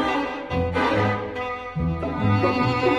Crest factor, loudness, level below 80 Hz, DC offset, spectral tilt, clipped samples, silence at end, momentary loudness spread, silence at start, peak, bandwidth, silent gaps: 16 dB; -24 LUFS; -40 dBFS; under 0.1%; -7.5 dB/octave; under 0.1%; 0 s; 7 LU; 0 s; -8 dBFS; 10 kHz; none